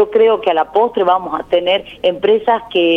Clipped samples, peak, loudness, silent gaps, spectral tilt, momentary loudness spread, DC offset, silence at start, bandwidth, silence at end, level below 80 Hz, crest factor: under 0.1%; -2 dBFS; -14 LUFS; none; -6 dB/octave; 5 LU; under 0.1%; 0 s; 4.8 kHz; 0 s; -52 dBFS; 12 dB